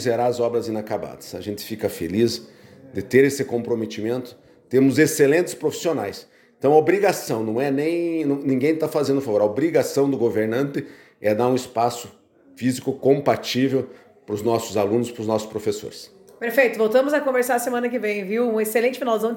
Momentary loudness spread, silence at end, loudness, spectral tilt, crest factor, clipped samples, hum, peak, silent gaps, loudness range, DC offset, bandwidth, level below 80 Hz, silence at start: 13 LU; 0 s; -22 LUFS; -5.5 dB/octave; 18 dB; under 0.1%; none; -4 dBFS; none; 3 LU; under 0.1%; 17 kHz; -64 dBFS; 0 s